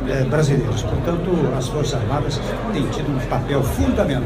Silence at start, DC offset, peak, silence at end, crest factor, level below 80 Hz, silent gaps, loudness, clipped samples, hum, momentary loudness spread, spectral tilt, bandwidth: 0 s; under 0.1%; -6 dBFS; 0 s; 14 dB; -30 dBFS; none; -20 LUFS; under 0.1%; none; 4 LU; -6.5 dB/octave; 15.5 kHz